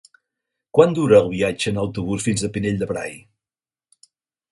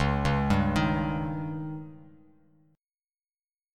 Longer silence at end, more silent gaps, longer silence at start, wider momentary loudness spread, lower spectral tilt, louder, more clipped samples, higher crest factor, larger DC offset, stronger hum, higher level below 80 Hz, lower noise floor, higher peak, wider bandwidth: second, 1.35 s vs 1.65 s; neither; first, 0.75 s vs 0 s; second, 10 LU vs 14 LU; second, -5.5 dB/octave vs -7 dB/octave; first, -20 LUFS vs -28 LUFS; neither; about the same, 20 dB vs 18 dB; neither; neither; second, -48 dBFS vs -40 dBFS; about the same, under -90 dBFS vs under -90 dBFS; first, 0 dBFS vs -12 dBFS; about the same, 11.5 kHz vs 12 kHz